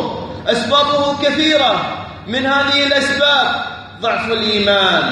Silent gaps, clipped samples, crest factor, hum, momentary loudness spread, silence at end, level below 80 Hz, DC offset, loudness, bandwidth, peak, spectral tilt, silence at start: none; under 0.1%; 14 dB; none; 10 LU; 0 s; -48 dBFS; under 0.1%; -14 LUFS; 11.5 kHz; -2 dBFS; -3.5 dB/octave; 0 s